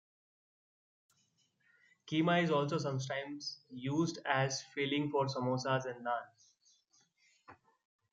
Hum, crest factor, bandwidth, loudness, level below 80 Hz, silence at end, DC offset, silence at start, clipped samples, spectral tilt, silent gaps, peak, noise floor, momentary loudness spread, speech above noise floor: none; 22 dB; 8.8 kHz; -35 LUFS; -80 dBFS; 0.6 s; under 0.1%; 2.05 s; under 0.1%; -5 dB/octave; none; -16 dBFS; -76 dBFS; 9 LU; 41 dB